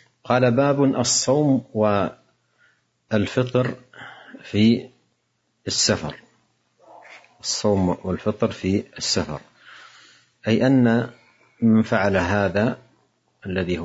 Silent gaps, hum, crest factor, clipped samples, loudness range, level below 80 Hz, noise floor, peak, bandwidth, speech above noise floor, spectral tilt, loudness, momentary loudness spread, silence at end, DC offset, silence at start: none; none; 18 dB; under 0.1%; 4 LU; -58 dBFS; -71 dBFS; -4 dBFS; 8 kHz; 50 dB; -5 dB/octave; -21 LUFS; 16 LU; 0 s; under 0.1%; 0.25 s